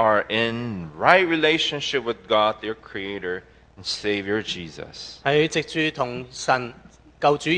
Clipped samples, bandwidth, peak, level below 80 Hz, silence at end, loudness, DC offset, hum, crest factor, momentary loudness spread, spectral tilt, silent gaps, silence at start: under 0.1%; 10 kHz; 0 dBFS; -56 dBFS; 0 s; -23 LUFS; under 0.1%; none; 24 dB; 14 LU; -4 dB/octave; none; 0 s